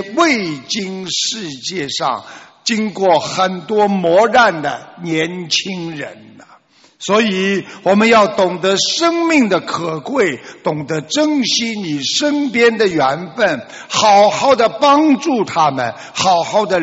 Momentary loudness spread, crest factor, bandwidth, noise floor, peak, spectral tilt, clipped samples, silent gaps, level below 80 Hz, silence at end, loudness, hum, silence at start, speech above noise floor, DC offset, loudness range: 11 LU; 14 dB; 8.2 kHz; -48 dBFS; 0 dBFS; -3.5 dB/octave; under 0.1%; none; -58 dBFS; 0 s; -15 LUFS; none; 0 s; 33 dB; under 0.1%; 5 LU